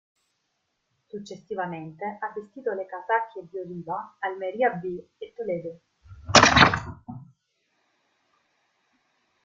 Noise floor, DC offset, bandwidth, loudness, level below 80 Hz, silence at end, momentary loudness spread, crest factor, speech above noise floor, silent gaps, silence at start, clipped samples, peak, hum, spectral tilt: -76 dBFS; under 0.1%; 11 kHz; -24 LUFS; -50 dBFS; 2.2 s; 24 LU; 28 dB; 45 dB; none; 1.15 s; under 0.1%; 0 dBFS; none; -3 dB/octave